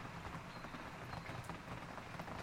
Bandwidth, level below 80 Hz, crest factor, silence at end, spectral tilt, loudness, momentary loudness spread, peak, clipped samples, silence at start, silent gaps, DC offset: 16 kHz; -62 dBFS; 16 dB; 0 s; -5 dB/octave; -49 LUFS; 2 LU; -32 dBFS; under 0.1%; 0 s; none; under 0.1%